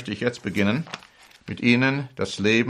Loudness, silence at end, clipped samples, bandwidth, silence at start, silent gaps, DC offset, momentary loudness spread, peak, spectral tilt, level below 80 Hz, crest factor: -23 LUFS; 0 s; under 0.1%; 12.5 kHz; 0 s; none; under 0.1%; 17 LU; -4 dBFS; -5.5 dB/octave; -60 dBFS; 20 dB